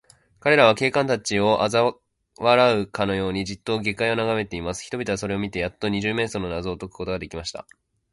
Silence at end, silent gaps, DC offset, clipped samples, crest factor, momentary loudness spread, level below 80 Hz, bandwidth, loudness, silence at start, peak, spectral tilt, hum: 0.5 s; none; under 0.1%; under 0.1%; 20 dB; 13 LU; -48 dBFS; 11.5 kHz; -23 LUFS; 0.45 s; -2 dBFS; -4.5 dB/octave; none